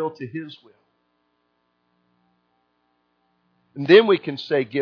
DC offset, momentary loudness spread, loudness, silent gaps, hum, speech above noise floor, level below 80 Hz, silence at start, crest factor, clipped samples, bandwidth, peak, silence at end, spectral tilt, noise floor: under 0.1%; 23 LU; -19 LUFS; none; 60 Hz at -70 dBFS; 51 dB; -76 dBFS; 0 s; 22 dB; under 0.1%; 5.4 kHz; -2 dBFS; 0 s; -7 dB/octave; -70 dBFS